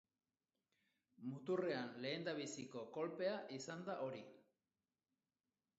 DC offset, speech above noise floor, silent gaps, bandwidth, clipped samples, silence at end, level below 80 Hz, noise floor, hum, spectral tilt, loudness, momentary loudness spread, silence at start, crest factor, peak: under 0.1%; over 44 dB; none; 7.6 kHz; under 0.1%; 1.4 s; under -90 dBFS; under -90 dBFS; none; -4 dB/octave; -46 LUFS; 9 LU; 1.2 s; 18 dB; -30 dBFS